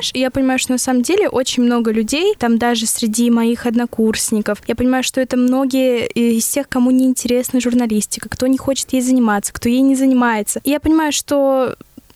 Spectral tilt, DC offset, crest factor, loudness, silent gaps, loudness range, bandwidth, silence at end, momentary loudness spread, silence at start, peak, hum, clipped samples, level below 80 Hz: -3.5 dB/octave; under 0.1%; 10 dB; -16 LUFS; none; 1 LU; 15 kHz; 0.45 s; 4 LU; 0 s; -6 dBFS; none; under 0.1%; -46 dBFS